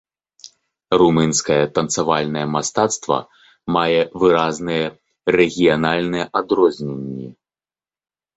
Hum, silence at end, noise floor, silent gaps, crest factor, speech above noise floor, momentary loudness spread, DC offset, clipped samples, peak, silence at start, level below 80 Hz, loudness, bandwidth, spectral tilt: none; 1.05 s; under -90 dBFS; none; 18 dB; over 72 dB; 12 LU; under 0.1%; under 0.1%; -2 dBFS; 0.45 s; -52 dBFS; -18 LUFS; 8.2 kHz; -4.5 dB/octave